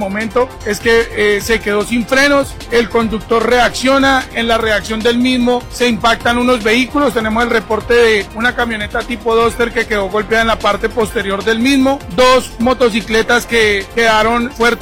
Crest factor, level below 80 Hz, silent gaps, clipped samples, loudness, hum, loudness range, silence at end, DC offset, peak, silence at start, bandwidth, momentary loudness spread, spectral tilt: 12 dB; -32 dBFS; none; under 0.1%; -13 LUFS; none; 2 LU; 0 s; 0.2%; 0 dBFS; 0 s; 17 kHz; 6 LU; -4 dB/octave